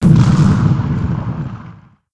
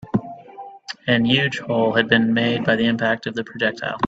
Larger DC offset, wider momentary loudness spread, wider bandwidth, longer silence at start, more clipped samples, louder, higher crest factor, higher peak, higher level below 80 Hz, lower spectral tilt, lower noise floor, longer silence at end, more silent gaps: neither; second, 16 LU vs 19 LU; first, 10.5 kHz vs 7.8 kHz; about the same, 0 s vs 0 s; neither; first, -14 LUFS vs -20 LUFS; second, 14 dB vs 20 dB; about the same, 0 dBFS vs 0 dBFS; first, -30 dBFS vs -56 dBFS; first, -8.5 dB/octave vs -6 dB/octave; about the same, -38 dBFS vs -39 dBFS; first, 0.4 s vs 0 s; neither